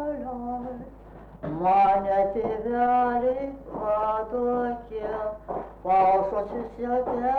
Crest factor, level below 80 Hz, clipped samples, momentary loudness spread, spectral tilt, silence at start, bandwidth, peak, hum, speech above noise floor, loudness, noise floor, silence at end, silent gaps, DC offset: 12 dB; -50 dBFS; under 0.1%; 14 LU; -8.5 dB/octave; 0 s; 4.7 kHz; -14 dBFS; none; 21 dB; -26 LUFS; -45 dBFS; 0 s; none; under 0.1%